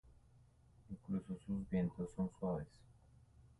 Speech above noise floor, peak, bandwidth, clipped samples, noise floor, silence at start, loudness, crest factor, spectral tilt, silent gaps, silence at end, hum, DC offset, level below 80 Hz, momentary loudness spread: 26 dB; -28 dBFS; 11 kHz; under 0.1%; -68 dBFS; 0.05 s; -43 LUFS; 16 dB; -9.5 dB/octave; none; 0.05 s; none; under 0.1%; -62 dBFS; 15 LU